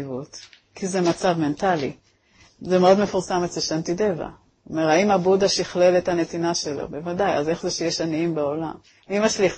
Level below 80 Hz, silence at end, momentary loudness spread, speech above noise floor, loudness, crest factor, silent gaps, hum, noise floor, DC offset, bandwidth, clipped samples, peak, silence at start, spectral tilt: -54 dBFS; 0 s; 13 LU; 34 dB; -22 LUFS; 18 dB; none; none; -56 dBFS; under 0.1%; 8.8 kHz; under 0.1%; -4 dBFS; 0 s; -4.5 dB/octave